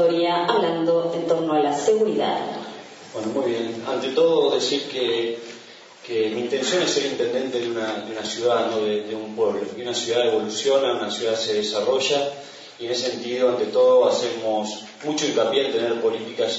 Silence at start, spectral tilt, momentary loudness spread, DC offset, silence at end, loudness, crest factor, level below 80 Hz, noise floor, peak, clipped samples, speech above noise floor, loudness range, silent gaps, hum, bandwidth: 0 s; -3.5 dB/octave; 10 LU; under 0.1%; 0 s; -22 LUFS; 16 dB; -72 dBFS; -44 dBFS; -6 dBFS; under 0.1%; 22 dB; 3 LU; none; none; 8 kHz